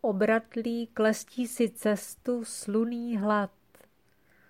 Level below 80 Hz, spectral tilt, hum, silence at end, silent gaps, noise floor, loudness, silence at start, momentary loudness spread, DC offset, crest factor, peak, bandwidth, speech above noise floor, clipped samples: -72 dBFS; -5 dB/octave; none; 1 s; none; -67 dBFS; -29 LUFS; 0.05 s; 7 LU; under 0.1%; 16 dB; -14 dBFS; 16 kHz; 38 dB; under 0.1%